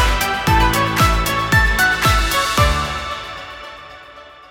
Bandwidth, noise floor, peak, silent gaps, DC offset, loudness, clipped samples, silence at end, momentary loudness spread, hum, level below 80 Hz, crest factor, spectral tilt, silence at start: 19 kHz; -40 dBFS; -2 dBFS; none; under 0.1%; -16 LUFS; under 0.1%; 0.2 s; 18 LU; none; -24 dBFS; 16 dB; -3.5 dB/octave; 0 s